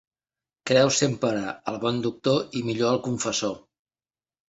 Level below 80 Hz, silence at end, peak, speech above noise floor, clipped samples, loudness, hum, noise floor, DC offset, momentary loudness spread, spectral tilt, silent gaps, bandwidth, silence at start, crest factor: -62 dBFS; 0.9 s; -6 dBFS; over 66 dB; under 0.1%; -25 LUFS; none; under -90 dBFS; under 0.1%; 10 LU; -4 dB/octave; none; 8.2 kHz; 0.65 s; 20 dB